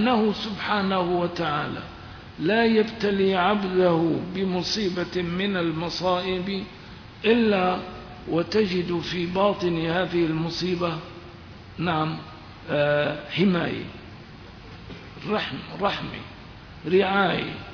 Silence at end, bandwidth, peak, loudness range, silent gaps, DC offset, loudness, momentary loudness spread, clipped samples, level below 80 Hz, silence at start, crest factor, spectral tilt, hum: 0 s; 5.4 kHz; -8 dBFS; 4 LU; none; under 0.1%; -24 LUFS; 20 LU; under 0.1%; -50 dBFS; 0 s; 18 dB; -6 dB/octave; none